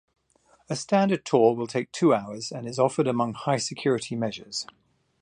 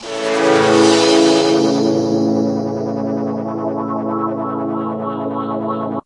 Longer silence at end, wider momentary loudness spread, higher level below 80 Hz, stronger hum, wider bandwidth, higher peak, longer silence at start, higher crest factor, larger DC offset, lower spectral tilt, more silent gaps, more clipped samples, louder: first, 0.6 s vs 0.05 s; about the same, 12 LU vs 10 LU; second, -68 dBFS vs -60 dBFS; neither; about the same, 10.5 kHz vs 11.5 kHz; second, -6 dBFS vs 0 dBFS; first, 0.7 s vs 0 s; about the same, 20 dB vs 16 dB; neither; about the same, -5.5 dB/octave vs -4.5 dB/octave; neither; neither; second, -26 LUFS vs -16 LUFS